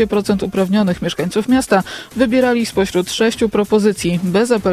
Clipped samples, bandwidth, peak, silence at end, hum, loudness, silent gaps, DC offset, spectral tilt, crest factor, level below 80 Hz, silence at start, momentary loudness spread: under 0.1%; 15.5 kHz; 0 dBFS; 0 s; none; -16 LUFS; none; under 0.1%; -5.5 dB/octave; 14 dB; -42 dBFS; 0 s; 4 LU